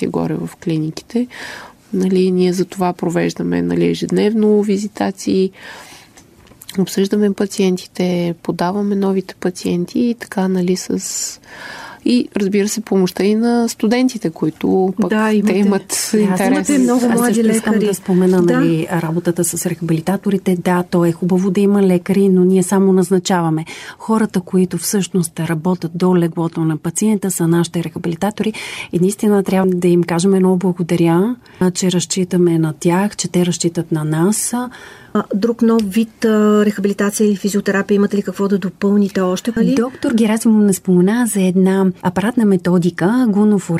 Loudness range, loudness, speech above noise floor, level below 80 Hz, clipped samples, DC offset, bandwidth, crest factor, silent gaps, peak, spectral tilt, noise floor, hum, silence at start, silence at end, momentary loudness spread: 4 LU; -16 LUFS; 29 dB; -54 dBFS; under 0.1%; under 0.1%; 15.5 kHz; 12 dB; none; -2 dBFS; -6 dB/octave; -44 dBFS; none; 0 s; 0 s; 8 LU